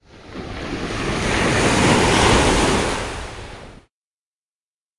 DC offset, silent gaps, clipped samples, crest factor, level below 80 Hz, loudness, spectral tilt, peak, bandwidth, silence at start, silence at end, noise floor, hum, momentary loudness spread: under 0.1%; none; under 0.1%; 18 dB; -32 dBFS; -18 LUFS; -4 dB/octave; -2 dBFS; 11.5 kHz; 0.15 s; 1.2 s; under -90 dBFS; none; 20 LU